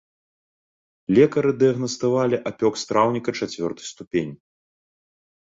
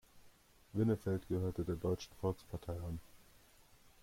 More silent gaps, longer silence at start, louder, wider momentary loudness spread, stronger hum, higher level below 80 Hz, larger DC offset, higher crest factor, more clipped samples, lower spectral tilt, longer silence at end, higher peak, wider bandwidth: first, 4.07-4.11 s vs none; first, 1.1 s vs 0.15 s; first, -22 LUFS vs -40 LUFS; about the same, 11 LU vs 10 LU; neither; about the same, -60 dBFS vs -60 dBFS; neither; about the same, 20 dB vs 18 dB; neither; second, -5.5 dB/octave vs -8 dB/octave; first, 1.05 s vs 0.85 s; first, -4 dBFS vs -24 dBFS; second, 8 kHz vs 16.5 kHz